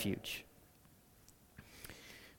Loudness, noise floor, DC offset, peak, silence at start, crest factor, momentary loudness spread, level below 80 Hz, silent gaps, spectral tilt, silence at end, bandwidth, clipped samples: -46 LUFS; -66 dBFS; under 0.1%; -26 dBFS; 0 s; 22 dB; 22 LU; -68 dBFS; none; -4 dB/octave; 0 s; 18 kHz; under 0.1%